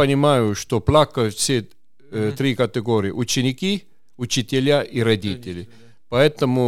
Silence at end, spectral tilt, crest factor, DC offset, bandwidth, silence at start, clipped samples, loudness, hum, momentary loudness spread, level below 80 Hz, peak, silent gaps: 0 s; -5 dB/octave; 18 dB; under 0.1%; 16 kHz; 0 s; under 0.1%; -20 LUFS; none; 11 LU; -46 dBFS; -2 dBFS; none